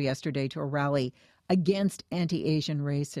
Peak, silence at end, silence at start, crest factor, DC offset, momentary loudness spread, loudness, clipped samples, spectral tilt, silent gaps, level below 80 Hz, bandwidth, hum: -12 dBFS; 0 s; 0 s; 18 dB; under 0.1%; 5 LU; -29 LUFS; under 0.1%; -6.5 dB/octave; none; -66 dBFS; 13.5 kHz; none